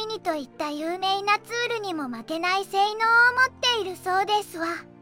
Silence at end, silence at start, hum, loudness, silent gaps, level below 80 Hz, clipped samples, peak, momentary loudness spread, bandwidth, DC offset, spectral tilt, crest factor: 0.15 s; 0 s; none; -24 LUFS; none; -68 dBFS; under 0.1%; -8 dBFS; 12 LU; 16.5 kHz; under 0.1%; -2 dB/octave; 16 dB